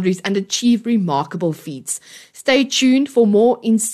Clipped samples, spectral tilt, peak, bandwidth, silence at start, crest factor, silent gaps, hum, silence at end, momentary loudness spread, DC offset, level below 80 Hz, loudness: under 0.1%; -4.5 dB/octave; -2 dBFS; 13 kHz; 0 s; 14 dB; none; none; 0 s; 11 LU; under 0.1%; -66 dBFS; -17 LUFS